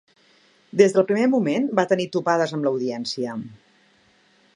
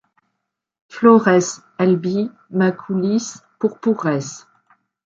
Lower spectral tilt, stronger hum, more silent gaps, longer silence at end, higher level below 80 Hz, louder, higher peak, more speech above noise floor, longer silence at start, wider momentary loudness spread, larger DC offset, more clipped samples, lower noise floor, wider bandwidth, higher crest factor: about the same, -5.5 dB/octave vs -6 dB/octave; neither; neither; first, 1 s vs 0.65 s; second, -72 dBFS vs -66 dBFS; second, -21 LUFS vs -18 LUFS; about the same, -2 dBFS vs -2 dBFS; second, 38 dB vs 60 dB; second, 0.75 s vs 0.95 s; second, 11 LU vs 15 LU; neither; neither; second, -59 dBFS vs -77 dBFS; first, 10.5 kHz vs 8 kHz; about the same, 20 dB vs 16 dB